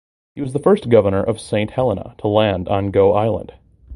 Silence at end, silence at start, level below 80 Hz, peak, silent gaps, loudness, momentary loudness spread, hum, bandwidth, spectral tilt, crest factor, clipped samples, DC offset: 0 s; 0.35 s; -40 dBFS; 0 dBFS; none; -17 LUFS; 9 LU; none; 11.5 kHz; -7.5 dB/octave; 18 dB; under 0.1%; under 0.1%